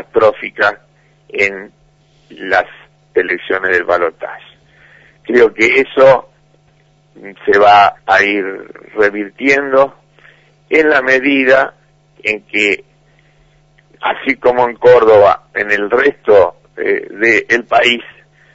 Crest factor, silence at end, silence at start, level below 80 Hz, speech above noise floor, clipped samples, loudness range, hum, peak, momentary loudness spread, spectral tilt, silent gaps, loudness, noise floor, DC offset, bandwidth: 14 dB; 0.5 s; 0.15 s; -50 dBFS; 40 dB; under 0.1%; 6 LU; none; 0 dBFS; 12 LU; -4.5 dB/octave; none; -12 LUFS; -51 dBFS; under 0.1%; 8 kHz